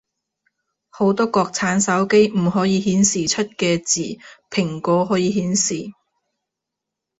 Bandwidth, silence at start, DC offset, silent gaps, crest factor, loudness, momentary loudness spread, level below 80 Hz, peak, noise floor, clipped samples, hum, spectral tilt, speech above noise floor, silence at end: 8.2 kHz; 0.95 s; under 0.1%; none; 18 dB; -19 LUFS; 8 LU; -56 dBFS; -2 dBFS; -83 dBFS; under 0.1%; none; -4 dB/octave; 64 dB; 1.3 s